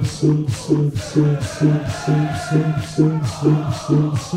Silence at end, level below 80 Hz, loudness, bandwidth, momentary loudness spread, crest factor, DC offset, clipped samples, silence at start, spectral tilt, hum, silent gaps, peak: 0 s; -44 dBFS; -19 LUFS; 11.5 kHz; 2 LU; 16 dB; under 0.1%; under 0.1%; 0 s; -7 dB/octave; none; none; -2 dBFS